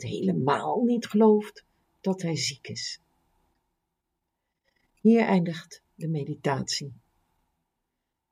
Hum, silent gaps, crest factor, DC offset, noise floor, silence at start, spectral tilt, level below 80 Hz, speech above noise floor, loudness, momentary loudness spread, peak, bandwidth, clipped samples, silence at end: none; none; 20 dB; under 0.1%; -82 dBFS; 0 s; -5.5 dB/octave; -70 dBFS; 57 dB; -26 LUFS; 15 LU; -8 dBFS; 14 kHz; under 0.1%; 1.4 s